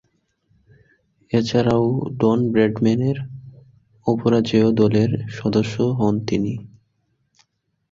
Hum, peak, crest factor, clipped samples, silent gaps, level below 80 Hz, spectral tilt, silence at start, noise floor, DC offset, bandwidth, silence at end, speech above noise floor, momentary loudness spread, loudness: none; -4 dBFS; 18 dB; under 0.1%; none; -52 dBFS; -7.5 dB/octave; 1.3 s; -70 dBFS; under 0.1%; 7.6 kHz; 1.25 s; 52 dB; 10 LU; -20 LUFS